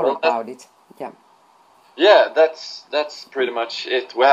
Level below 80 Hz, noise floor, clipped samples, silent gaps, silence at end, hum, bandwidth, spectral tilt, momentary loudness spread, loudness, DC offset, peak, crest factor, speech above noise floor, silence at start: -82 dBFS; -54 dBFS; under 0.1%; none; 0 s; none; 9.4 kHz; -3 dB/octave; 22 LU; -19 LUFS; under 0.1%; 0 dBFS; 20 dB; 35 dB; 0 s